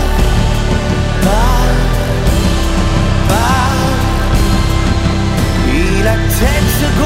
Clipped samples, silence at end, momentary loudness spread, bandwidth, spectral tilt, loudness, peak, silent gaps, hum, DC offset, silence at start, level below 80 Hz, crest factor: under 0.1%; 0 s; 2 LU; 16.5 kHz; -5.5 dB/octave; -13 LUFS; 0 dBFS; none; none; under 0.1%; 0 s; -14 dBFS; 10 dB